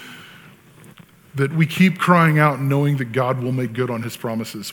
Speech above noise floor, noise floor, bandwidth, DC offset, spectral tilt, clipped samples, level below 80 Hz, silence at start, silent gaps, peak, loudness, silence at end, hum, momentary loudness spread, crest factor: 28 dB; -46 dBFS; 18.5 kHz; under 0.1%; -6.5 dB/octave; under 0.1%; -64 dBFS; 0 s; none; -2 dBFS; -19 LUFS; 0 s; none; 12 LU; 18 dB